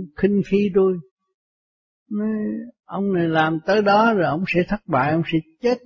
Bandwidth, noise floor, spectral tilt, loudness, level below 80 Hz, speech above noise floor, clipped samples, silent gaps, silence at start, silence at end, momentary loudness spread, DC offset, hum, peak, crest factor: 6.8 kHz; under -90 dBFS; -8 dB/octave; -20 LUFS; -52 dBFS; over 70 dB; under 0.1%; 1.11-1.17 s, 1.34-2.06 s; 0 s; 0.1 s; 11 LU; under 0.1%; none; -6 dBFS; 14 dB